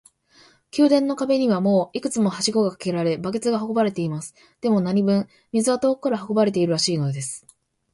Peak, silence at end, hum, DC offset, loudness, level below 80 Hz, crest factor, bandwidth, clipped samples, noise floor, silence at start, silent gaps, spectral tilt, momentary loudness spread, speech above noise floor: -6 dBFS; 0.55 s; none; under 0.1%; -22 LUFS; -64 dBFS; 16 dB; 11.5 kHz; under 0.1%; -55 dBFS; 0.75 s; none; -5.5 dB/octave; 9 LU; 34 dB